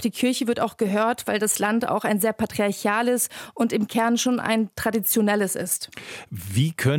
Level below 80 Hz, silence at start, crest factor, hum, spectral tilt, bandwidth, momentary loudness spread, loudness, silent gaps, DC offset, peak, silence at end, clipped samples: -62 dBFS; 0 s; 16 dB; none; -4.5 dB/octave; 17.5 kHz; 6 LU; -23 LUFS; none; under 0.1%; -8 dBFS; 0 s; under 0.1%